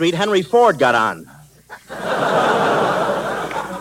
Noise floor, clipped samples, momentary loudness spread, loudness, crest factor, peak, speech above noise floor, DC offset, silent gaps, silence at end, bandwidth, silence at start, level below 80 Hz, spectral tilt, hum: -41 dBFS; under 0.1%; 11 LU; -17 LUFS; 16 dB; -2 dBFS; 26 dB; under 0.1%; none; 0 s; 16.5 kHz; 0 s; -54 dBFS; -4.5 dB/octave; none